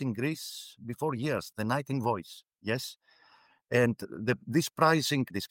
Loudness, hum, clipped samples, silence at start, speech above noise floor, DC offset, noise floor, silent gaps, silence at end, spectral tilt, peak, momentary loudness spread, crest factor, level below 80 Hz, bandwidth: -30 LUFS; none; under 0.1%; 0 s; 33 dB; under 0.1%; -63 dBFS; none; 0.05 s; -5 dB/octave; -12 dBFS; 15 LU; 20 dB; -70 dBFS; 17 kHz